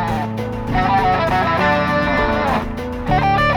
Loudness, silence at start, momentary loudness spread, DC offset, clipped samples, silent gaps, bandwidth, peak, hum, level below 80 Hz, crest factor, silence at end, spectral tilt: -17 LUFS; 0 s; 8 LU; under 0.1%; under 0.1%; none; 19 kHz; -4 dBFS; none; -30 dBFS; 14 dB; 0 s; -6.5 dB/octave